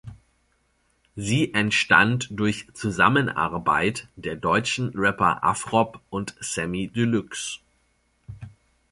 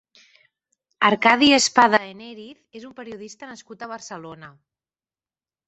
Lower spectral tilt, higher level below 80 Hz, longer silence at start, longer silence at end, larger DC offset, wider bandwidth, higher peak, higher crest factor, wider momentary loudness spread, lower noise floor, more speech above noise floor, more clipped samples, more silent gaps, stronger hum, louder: first, -4.5 dB/octave vs -2.5 dB/octave; first, -52 dBFS vs -64 dBFS; second, 0.05 s vs 1 s; second, 0.45 s vs 1.2 s; neither; first, 11.5 kHz vs 8.6 kHz; about the same, -2 dBFS vs -2 dBFS; about the same, 22 dB vs 22 dB; second, 14 LU vs 26 LU; second, -67 dBFS vs under -90 dBFS; second, 44 dB vs over 68 dB; neither; neither; neither; second, -23 LUFS vs -16 LUFS